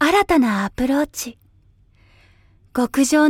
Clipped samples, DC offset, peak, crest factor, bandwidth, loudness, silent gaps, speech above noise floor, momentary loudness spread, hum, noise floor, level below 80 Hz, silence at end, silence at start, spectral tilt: under 0.1%; under 0.1%; -4 dBFS; 16 dB; 16.5 kHz; -19 LUFS; none; 37 dB; 13 LU; none; -54 dBFS; -46 dBFS; 0 s; 0 s; -4 dB/octave